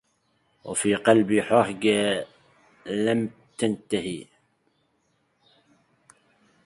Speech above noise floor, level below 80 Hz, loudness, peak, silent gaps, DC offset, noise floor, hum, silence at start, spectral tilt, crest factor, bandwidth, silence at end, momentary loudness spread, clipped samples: 47 dB; -64 dBFS; -24 LUFS; -4 dBFS; none; under 0.1%; -70 dBFS; none; 0.65 s; -4.5 dB/octave; 24 dB; 11.5 kHz; 2.4 s; 16 LU; under 0.1%